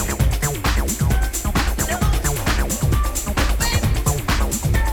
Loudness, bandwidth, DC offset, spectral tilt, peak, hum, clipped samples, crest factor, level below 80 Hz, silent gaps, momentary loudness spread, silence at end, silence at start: -20 LUFS; over 20 kHz; under 0.1%; -4 dB/octave; -2 dBFS; none; under 0.1%; 16 dB; -22 dBFS; none; 2 LU; 0 s; 0 s